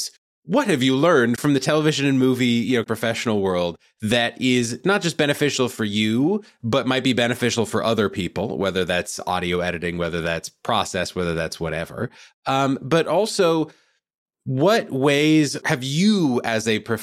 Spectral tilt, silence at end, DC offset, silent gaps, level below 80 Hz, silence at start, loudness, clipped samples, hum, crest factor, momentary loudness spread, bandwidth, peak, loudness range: -5 dB/octave; 0 s; under 0.1%; 0.18-0.43 s, 12.34-12.43 s, 14.18-14.26 s; -54 dBFS; 0 s; -21 LUFS; under 0.1%; none; 16 dB; 8 LU; 15.5 kHz; -4 dBFS; 4 LU